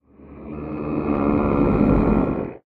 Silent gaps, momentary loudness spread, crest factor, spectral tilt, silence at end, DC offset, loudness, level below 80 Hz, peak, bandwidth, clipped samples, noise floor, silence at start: none; 16 LU; 16 dB; -11.5 dB/octave; 0.1 s; under 0.1%; -20 LUFS; -32 dBFS; -4 dBFS; 4.7 kHz; under 0.1%; -40 dBFS; 0.2 s